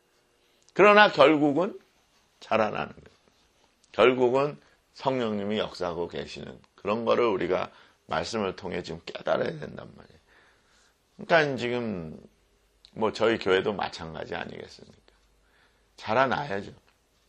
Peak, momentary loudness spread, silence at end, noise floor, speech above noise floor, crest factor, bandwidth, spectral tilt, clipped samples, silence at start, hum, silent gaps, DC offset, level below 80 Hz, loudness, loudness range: -2 dBFS; 19 LU; 0.55 s; -66 dBFS; 41 dB; 24 dB; 9.6 kHz; -5.5 dB/octave; under 0.1%; 0.75 s; none; none; under 0.1%; -62 dBFS; -26 LUFS; 9 LU